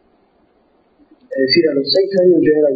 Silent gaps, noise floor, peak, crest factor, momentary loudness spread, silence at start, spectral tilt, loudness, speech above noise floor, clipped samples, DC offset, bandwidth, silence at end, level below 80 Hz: none; -56 dBFS; -2 dBFS; 12 dB; 7 LU; 1.3 s; -4 dB/octave; -13 LUFS; 44 dB; under 0.1%; under 0.1%; 7.4 kHz; 0 s; -58 dBFS